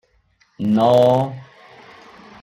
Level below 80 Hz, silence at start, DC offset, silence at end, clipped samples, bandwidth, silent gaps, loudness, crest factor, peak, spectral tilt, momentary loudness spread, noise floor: -60 dBFS; 0.6 s; under 0.1%; 1 s; under 0.1%; 15.5 kHz; none; -17 LUFS; 16 dB; -4 dBFS; -8 dB/octave; 14 LU; -60 dBFS